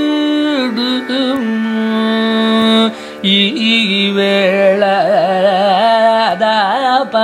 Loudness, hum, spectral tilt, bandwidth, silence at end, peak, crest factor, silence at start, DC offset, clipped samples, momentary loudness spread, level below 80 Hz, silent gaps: -12 LUFS; none; -5 dB/octave; 13 kHz; 0 s; 0 dBFS; 12 dB; 0 s; under 0.1%; under 0.1%; 5 LU; -62 dBFS; none